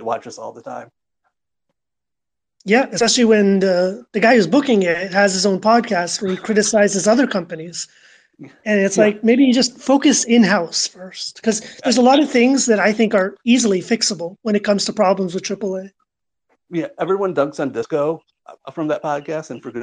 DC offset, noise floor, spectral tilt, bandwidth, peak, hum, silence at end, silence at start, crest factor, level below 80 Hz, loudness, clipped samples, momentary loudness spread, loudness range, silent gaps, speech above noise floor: under 0.1%; -86 dBFS; -4 dB/octave; 10 kHz; -2 dBFS; none; 0 s; 0 s; 16 dB; -64 dBFS; -17 LUFS; under 0.1%; 15 LU; 7 LU; none; 69 dB